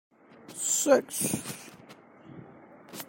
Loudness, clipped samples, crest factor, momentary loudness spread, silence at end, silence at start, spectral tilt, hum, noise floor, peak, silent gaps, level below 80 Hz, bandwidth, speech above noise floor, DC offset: -27 LUFS; under 0.1%; 22 dB; 26 LU; 0.05 s; 0.5 s; -3 dB/octave; none; -53 dBFS; -8 dBFS; none; -72 dBFS; 16.5 kHz; 25 dB; under 0.1%